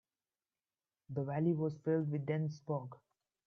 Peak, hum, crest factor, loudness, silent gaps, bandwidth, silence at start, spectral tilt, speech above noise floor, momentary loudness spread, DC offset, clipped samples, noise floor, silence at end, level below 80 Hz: -22 dBFS; none; 16 dB; -37 LUFS; none; 6.6 kHz; 1.1 s; -9.5 dB/octave; over 54 dB; 7 LU; under 0.1%; under 0.1%; under -90 dBFS; 0.5 s; -80 dBFS